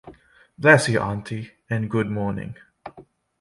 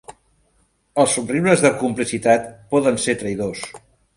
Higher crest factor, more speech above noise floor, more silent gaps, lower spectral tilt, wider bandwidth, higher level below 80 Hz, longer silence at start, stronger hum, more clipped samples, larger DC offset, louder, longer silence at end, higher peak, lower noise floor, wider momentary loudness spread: about the same, 22 dB vs 20 dB; second, 29 dB vs 44 dB; neither; about the same, -5.5 dB/octave vs -4.5 dB/octave; about the same, 11.5 kHz vs 11.5 kHz; about the same, -54 dBFS vs -54 dBFS; about the same, 0.05 s vs 0.1 s; neither; neither; neither; about the same, -21 LUFS vs -19 LUFS; about the same, 0.4 s vs 0.4 s; about the same, -2 dBFS vs 0 dBFS; second, -50 dBFS vs -63 dBFS; first, 26 LU vs 11 LU